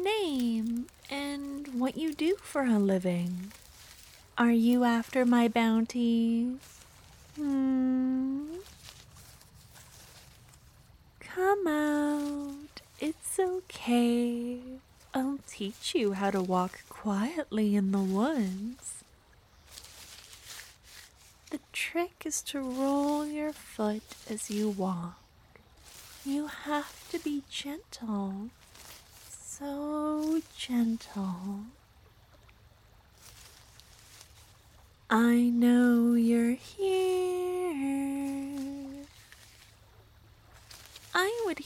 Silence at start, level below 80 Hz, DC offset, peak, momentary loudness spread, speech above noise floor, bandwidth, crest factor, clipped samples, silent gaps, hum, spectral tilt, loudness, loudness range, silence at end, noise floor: 0 s; -64 dBFS; under 0.1%; -12 dBFS; 24 LU; 31 dB; 17.5 kHz; 18 dB; under 0.1%; none; none; -5 dB/octave; -30 LUFS; 10 LU; 0 s; -60 dBFS